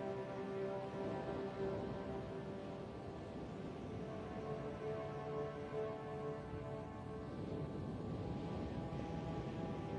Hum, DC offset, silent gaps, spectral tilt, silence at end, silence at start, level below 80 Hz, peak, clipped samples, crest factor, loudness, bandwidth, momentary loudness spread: none; under 0.1%; none; -8 dB/octave; 0 s; 0 s; -60 dBFS; -30 dBFS; under 0.1%; 14 dB; -46 LUFS; 10 kHz; 5 LU